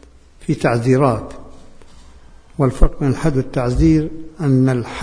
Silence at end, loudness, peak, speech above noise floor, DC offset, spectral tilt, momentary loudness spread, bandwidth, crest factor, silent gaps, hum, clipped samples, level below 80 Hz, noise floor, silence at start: 0 s; -17 LUFS; 0 dBFS; 26 dB; under 0.1%; -8 dB/octave; 12 LU; 10.5 kHz; 18 dB; none; none; under 0.1%; -24 dBFS; -42 dBFS; 0.4 s